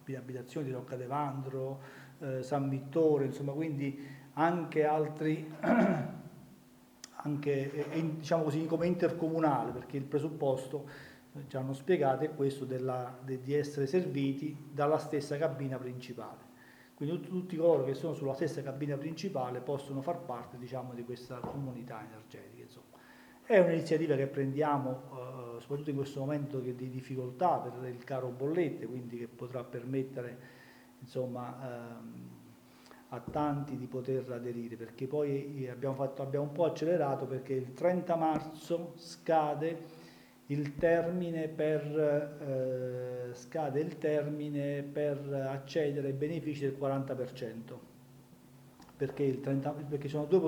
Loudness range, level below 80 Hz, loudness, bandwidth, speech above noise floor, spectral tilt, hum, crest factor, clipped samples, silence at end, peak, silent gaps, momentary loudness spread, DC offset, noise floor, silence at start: 7 LU; -72 dBFS; -35 LUFS; over 20 kHz; 25 dB; -7.5 dB/octave; none; 22 dB; under 0.1%; 0 s; -12 dBFS; none; 14 LU; under 0.1%; -60 dBFS; 0 s